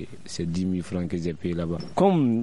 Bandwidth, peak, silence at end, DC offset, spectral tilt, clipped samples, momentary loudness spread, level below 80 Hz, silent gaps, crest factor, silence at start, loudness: 11 kHz; -8 dBFS; 0 s; 0.8%; -7.5 dB/octave; under 0.1%; 9 LU; -52 dBFS; none; 18 dB; 0 s; -26 LUFS